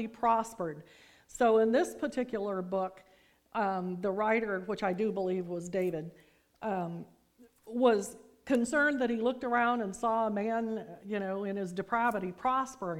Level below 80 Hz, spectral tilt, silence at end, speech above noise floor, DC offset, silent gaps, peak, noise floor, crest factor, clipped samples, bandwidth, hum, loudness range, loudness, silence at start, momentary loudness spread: -66 dBFS; -5.5 dB/octave; 0 s; 31 dB; under 0.1%; none; -12 dBFS; -63 dBFS; 20 dB; under 0.1%; 16.5 kHz; none; 4 LU; -32 LUFS; 0 s; 12 LU